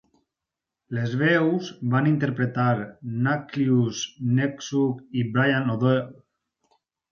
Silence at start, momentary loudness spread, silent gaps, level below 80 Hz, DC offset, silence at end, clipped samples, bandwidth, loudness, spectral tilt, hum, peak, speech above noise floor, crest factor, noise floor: 0.9 s; 7 LU; none; -64 dBFS; under 0.1%; 1 s; under 0.1%; 7 kHz; -24 LUFS; -6.5 dB/octave; none; -8 dBFS; 64 dB; 18 dB; -87 dBFS